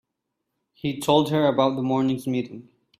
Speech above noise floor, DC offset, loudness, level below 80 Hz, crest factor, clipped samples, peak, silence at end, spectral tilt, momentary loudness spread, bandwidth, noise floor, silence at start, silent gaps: 58 dB; under 0.1%; -23 LUFS; -62 dBFS; 18 dB; under 0.1%; -6 dBFS; 0.4 s; -6.5 dB/octave; 11 LU; 15 kHz; -80 dBFS; 0.85 s; none